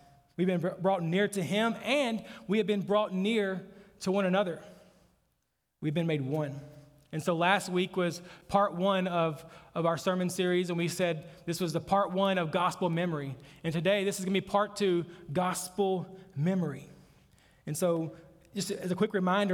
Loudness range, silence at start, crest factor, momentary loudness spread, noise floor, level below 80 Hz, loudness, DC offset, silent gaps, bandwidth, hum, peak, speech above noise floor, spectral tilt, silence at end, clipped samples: 4 LU; 0.4 s; 20 dB; 10 LU; -79 dBFS; -68 dBFS; -31 LUFS; under 0.1%; none; 18 kHz; none; -10 dBFS; 49 dB; -5.5 dB/octave; 0 s; under 0.1%